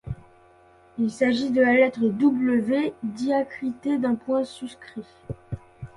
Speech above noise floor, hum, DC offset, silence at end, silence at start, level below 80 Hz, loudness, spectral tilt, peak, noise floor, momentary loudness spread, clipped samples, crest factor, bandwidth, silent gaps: 31 dB; none; under 0.1%; 0.1 s; 0.05 s; -54 dBFS; -23 LUFS; -6.5 dB/octave; -6 dBFS; -55 dBFS; 20 LU; under 0.1%; 18 dB; 11 kHz; none